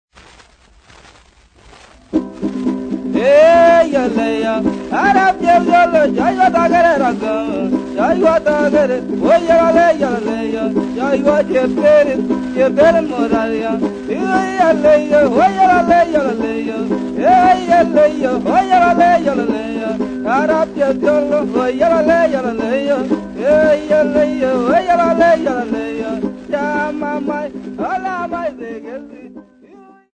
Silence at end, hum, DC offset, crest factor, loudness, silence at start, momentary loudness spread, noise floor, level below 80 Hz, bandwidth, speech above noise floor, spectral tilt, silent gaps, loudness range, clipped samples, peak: 0.75 s; none; under 0.1%; 14 dB; -14 LUFS; 2.15 s; 10 LU; -47 dBFS; -44 dBFS; 9.4 kHz; 34 dB; -6 dB/octave; none; 5 LU; under 0.1%; 0 dBFS